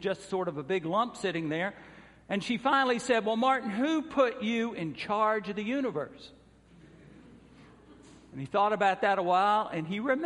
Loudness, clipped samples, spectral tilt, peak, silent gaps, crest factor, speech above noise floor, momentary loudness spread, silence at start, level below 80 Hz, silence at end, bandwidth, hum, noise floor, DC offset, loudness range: -29 LUFS; under 0.1%; -5 dB/octave; -12 dBFS; none; 18 dB; 28 dB; 9 LU; 0 s; -66 dBFS; 0 s; 11.5 kHz; none; -57 dBFS; under 0.1%; 6 LU